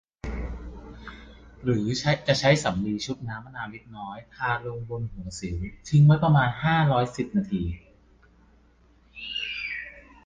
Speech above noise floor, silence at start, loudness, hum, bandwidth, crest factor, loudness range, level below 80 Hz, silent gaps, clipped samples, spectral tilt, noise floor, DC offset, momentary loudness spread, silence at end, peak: 34 dB; 0.25 s; -25 LUFS; none; 9.4 kHz; 20 dB; 7 LU; -44 dBFS; none; under 0.1%; -6 dB/octave; -58 dBFS; under 0.1%; 20 LU; 0.25 s; -6 dBFS